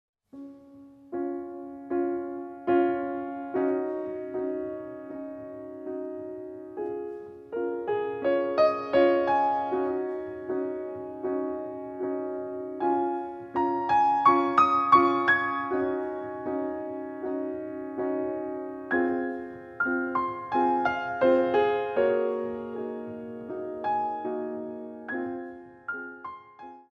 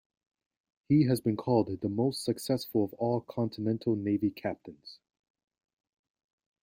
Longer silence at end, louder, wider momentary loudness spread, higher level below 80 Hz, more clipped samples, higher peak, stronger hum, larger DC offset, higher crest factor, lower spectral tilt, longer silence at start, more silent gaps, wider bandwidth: second, 0.1 s vs 1.7 s; about the same, -28 LUFS vs -30 LUFS; first, 17 LU vs 11 LU; about the same, -66 dBFS vs -68 dBFS; neither; first, -6 dBFS vs -14 dBFS; neither; neither; about the same, 22 dB vs 18 dB; about the same, -7 dB/octave vs -7 dB/octave; second, 0.35 s vs 0.9 s; neither; second, 7 kHz vs 16.5 kHz